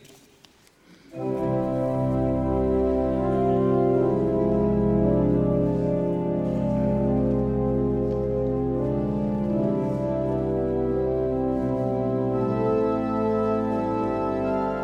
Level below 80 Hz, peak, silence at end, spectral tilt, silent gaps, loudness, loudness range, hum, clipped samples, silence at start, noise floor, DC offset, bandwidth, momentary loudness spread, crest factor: -38 dBFS; -10 dBFS; 0 s; -10.5 dB/octave; none; -24 LUFS; 3 LU; none; under 0.1%; 1.1 s; -56 dBFS; under 0.1%; 7.4 kHz; 4 LU; 14 dB